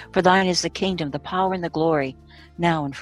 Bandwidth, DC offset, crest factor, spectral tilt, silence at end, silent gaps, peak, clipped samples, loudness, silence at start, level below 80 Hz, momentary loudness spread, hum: 12 kHz; under 0.1%; 20 dB; -5 dB/octave; 0 s; none; -2 dBFS; under 0.1%; -22 LUFS; 0 s; -50 dBFS; 8 LU; none